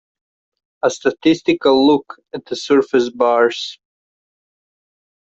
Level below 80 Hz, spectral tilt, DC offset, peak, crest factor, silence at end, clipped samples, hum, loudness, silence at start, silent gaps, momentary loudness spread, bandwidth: -60 dBFS; -4.5 dB/octave; under 0.1%; -2 dBFS; 16 dB; 1.6 s; under 0.1%; none; -16 LUFS; 0.85 s; none; 14 LU; 8 kHz